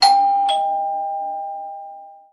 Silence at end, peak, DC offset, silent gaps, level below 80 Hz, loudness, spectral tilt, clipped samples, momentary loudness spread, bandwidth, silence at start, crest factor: 0.2 s; 0 dBFS; under 0.1%; none; -70 dBFS; -20 LUFS; 0.5 dB/octave; under 0.1%; 20 LU; 11.5 kHz; 0 s; 18 dB